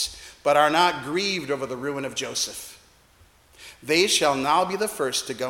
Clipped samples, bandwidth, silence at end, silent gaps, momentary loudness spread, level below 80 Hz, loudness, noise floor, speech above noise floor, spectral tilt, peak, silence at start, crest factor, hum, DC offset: under 0.1%; 17.5 kHz; 0 s; none; 11 LU; -58 dBFS; -23 LUFS; -56 dBFS; 33 dB; -2.5 dB/octave; -6 dBFS; 0 s; 20 dB; none; under 0.1%